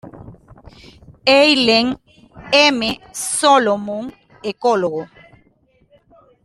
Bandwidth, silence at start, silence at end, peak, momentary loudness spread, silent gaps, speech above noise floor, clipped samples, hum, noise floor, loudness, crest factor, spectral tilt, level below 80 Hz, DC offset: 13 kHz; 0.05 s; 1.4 s; 0 dBFS; 17 LU; none; 41 dB; under 0.1%; none; -57 dBFS; -15 LUFS; 18 dB; -2.5 dB/octave; -52 dBFS; under 0.1%